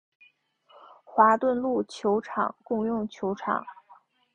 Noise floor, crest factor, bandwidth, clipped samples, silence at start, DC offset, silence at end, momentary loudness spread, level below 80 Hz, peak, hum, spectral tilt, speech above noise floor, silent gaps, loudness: -62 dBFS; 22 dB; 9.6 kHz; under 0.1%; 1.1 s; under 0.1%; 0.6 s; 11 LU; -68 dBFS; -6 dBFS; none; -6.5 dB/octave; 36 dB; none; -26 LUFS